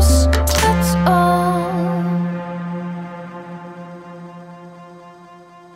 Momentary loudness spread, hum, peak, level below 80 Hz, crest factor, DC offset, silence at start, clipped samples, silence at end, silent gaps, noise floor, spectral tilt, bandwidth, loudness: 23 LU; none; -2 dBFS; -24 dBFS; 18 dB; under 0.1%; 0 s; under 0.1%; 0.2 s; none; -42 dBFS; -5.5 dB/octave; 16 kHz; -17 LUFS